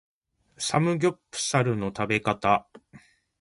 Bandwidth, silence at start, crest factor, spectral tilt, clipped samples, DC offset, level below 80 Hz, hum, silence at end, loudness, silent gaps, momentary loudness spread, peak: 11.5 kHz; 0.6 s; 20 dB; -4.5 dB/octave; under 0.1%; under 0.1%; -58 dBFS; none; 0.45 s; -26 LUFS; none; 5 LU; -8 dBFS